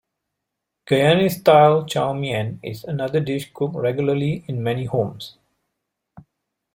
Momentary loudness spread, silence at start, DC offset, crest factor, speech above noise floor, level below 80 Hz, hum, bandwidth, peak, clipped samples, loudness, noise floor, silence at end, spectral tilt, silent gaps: 14 LU; 0.9 s; under 0.1%; 20 dB; 61 dB; -58 dBFS; none; 16.5 kHz; -2 dBFS; under 0.1%; -20 LUFS; -81 dBFS; 0.55 s; -6.5 dB/octave; none